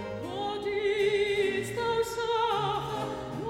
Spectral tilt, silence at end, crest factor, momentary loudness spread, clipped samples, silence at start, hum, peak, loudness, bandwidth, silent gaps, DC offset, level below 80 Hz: -4.5 dB/octave; 0 s; 14 dB; 8 LU; under 0.1%; 0 s; none; -16 dBFS; -29 LUFS; 16 kHz; none; under 0.1%; -56 dBFS